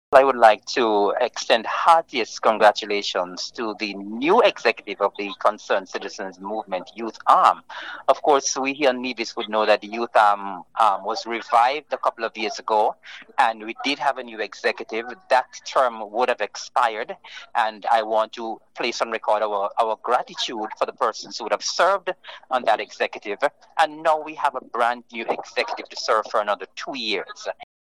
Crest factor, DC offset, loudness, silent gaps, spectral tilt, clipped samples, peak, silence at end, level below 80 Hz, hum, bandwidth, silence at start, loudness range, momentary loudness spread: 22 dB; 0.1%; -22 LUFS; none; -2 dB/octave; under 0.1%; 0 dBFS; 0.3 s; -72 dBFS; none; 11.5 kHz; 0.1 s; 4 LU; 12 LU